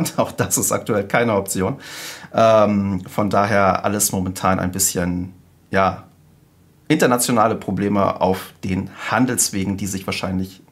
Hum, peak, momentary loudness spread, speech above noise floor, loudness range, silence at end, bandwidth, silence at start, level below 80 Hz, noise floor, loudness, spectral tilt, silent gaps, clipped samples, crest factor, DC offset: none; 0 dBFS; 9 LU; 34 dB; 3 LU; 0.15 s; 16 kHz; 0 s; -54 dBFS; -53 dBFS; -19 LUFS; -4.5 dB/octave; none; under 0.1%; 18 dB; under 0.1%